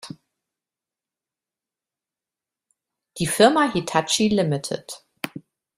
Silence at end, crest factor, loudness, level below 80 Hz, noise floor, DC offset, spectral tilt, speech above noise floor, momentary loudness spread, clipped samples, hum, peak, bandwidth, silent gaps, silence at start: 0.4 s; 22 dB; -20 LUFS; -60 dBFS; -89 dBFS; under 0.1%; -4 dB/octave; 69 dB; 17 LU; under 0.1%; none; -2 dBFS; 15 kHz; none; 0.05 s